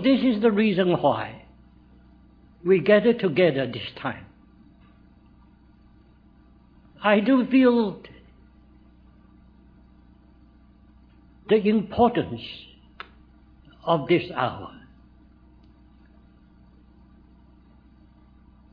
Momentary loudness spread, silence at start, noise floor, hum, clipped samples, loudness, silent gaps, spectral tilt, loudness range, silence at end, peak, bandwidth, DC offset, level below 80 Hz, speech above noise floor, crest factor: 22 LU; 0 s; -54 dBFS; none; under 0.1%; -22 LUFS; none; -9.5 dB/octave; 8 LU; 3.95 s; -4 dBFS; 5 kHz; under 0.1%; -56 dBFS; 33 dB; 22 dB